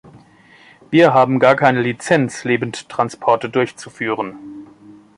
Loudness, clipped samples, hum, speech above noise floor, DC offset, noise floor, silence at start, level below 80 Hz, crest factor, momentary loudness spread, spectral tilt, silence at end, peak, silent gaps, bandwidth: -16 LUFS; under 0.1%; none; 31 dB; under 0.1%; -47 dBFS; 0.9 s; -60 dBFS; 16 dB; 12 LU; -6 dB/octave; 0.25 s; 0 dBFS; none; 11.5 kHz